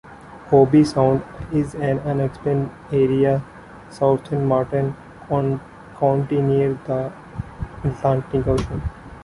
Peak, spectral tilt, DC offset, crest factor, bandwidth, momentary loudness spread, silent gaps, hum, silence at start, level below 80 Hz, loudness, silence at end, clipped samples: -2 dBFS; -8.5 dB/octave; under 0.1%; 18 dB; 11.5 kHz; 16 LU; none; none; 0.05 s; -40 dBFS; -20 LUFS; 0 s; under 0.1%